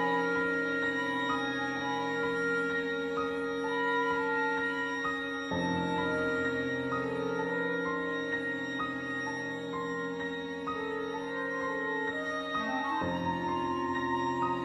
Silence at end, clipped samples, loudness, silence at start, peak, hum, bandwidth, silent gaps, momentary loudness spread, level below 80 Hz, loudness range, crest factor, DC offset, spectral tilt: 0 s; under 0.1%; -32 LUFS; 0 s; -18 dBFS; none; 12 kHz; none; 5 LU; -66 dBFS; 3 LU; 14 dB; under 0.1%; -5.5 dB/octave